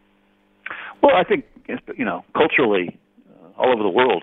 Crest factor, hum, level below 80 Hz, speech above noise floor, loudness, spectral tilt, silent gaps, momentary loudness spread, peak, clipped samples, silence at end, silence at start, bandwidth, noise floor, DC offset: 20 dB; none; -60 dBFS; 41 dB; -19 LUFS; -8 dB/octave; none; 16 LU; 0 dBFS; under 0.1%; 0 s; 0.65 s; 4.1 kHz; -60 dBFS; under 0.1%